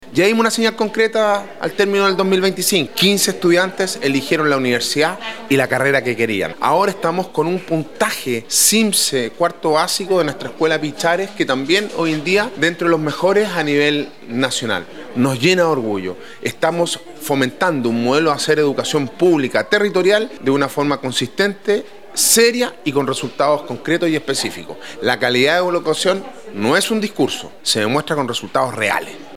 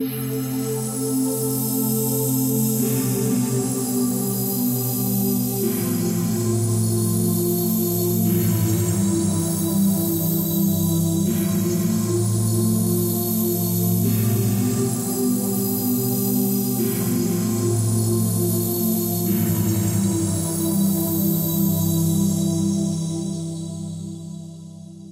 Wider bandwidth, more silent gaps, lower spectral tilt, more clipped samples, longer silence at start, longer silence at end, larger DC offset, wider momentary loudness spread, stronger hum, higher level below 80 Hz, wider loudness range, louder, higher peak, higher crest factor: about the same, 16.5 kHz vs 16 kHz; neither; second, -3.5 dB/octave vs -6 dB/octave; neither; about the same, 0 s vs 0 s; about the same, 0 s vs 0 s; first, 0.8% vs under 0.1%; about the same, 7 LU vs 5 LU; neither; second, -62 dBFS vs -52 dBFS; about the same, 2 LU vs 1 LU; first, -17 LUFS vs -21 LUFS; first, 0 dBFS vs -10 dBFS; first, 18 dB vs 12 dB